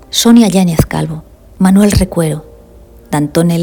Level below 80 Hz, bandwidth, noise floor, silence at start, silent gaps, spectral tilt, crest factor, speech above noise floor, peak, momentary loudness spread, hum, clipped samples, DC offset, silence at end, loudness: -28 dBFS; 19.5 kHz; -38 dBFS; 0.1 s; none; -5.5 dB/octave; 12 dB; 28 dB; 0 dBFS; 13 LU; none; 1%; under 0.1%; 0 s; -11 LUFS